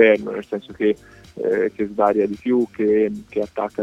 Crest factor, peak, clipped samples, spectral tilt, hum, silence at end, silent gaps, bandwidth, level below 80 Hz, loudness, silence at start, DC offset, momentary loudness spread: 18 dB; -2 dBFS; under 0.1%; -7 dB/octave; none; 0 s; none; 8 kHz; -56 dBFS; -21 LUFS; 0 s; under 0.1%; 9 LU